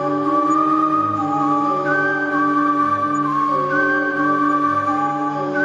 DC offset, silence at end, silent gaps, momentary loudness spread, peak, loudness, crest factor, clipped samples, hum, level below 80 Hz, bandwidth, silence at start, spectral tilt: under 0.1%; 0 s; none; 3 LU; -6 dBFS; -18 LUFS; 12 dB; under 0.1%; none; -66 dBFS; 10.5 kHz; 0 s; -6.5 dB/octave